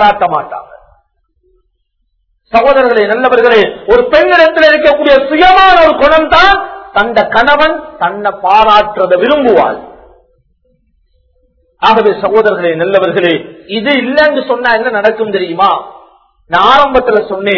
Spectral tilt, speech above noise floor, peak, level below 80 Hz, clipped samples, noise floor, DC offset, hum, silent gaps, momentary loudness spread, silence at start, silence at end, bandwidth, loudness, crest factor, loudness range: -5.5 dB/octave; 53 dB; 0 dBFS; -36 dBFS; 2%; -61 dBFS; under 0.1%; none; none; 9 LU; 0 s; 0 s; 6 kHz; -8 LUFS; 10 dB; 7 LU